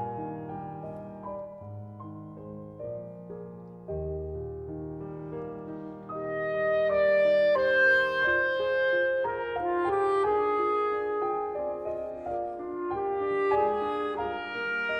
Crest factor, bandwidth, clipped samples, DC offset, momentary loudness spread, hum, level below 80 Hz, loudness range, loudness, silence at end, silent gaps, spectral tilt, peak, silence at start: 14 dB; 8.8 kHz; under 0.1%; under 0.1%; 19 LU; none; -54 dBFS; 15 LU; -28 LUFS; 0 s; none; -6.5 dB/octave; -14 dBFS; 0 s